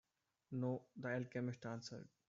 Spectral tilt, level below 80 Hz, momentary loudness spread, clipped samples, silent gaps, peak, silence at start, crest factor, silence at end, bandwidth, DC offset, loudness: -6.5 dB/octave; -82 dBFS; 7 LU; under 0.1%; none; -30 dBFS; 0.5 s; 16 dB; 0.2 s; 7.6 kHz; under 0.1%; -46 LUFS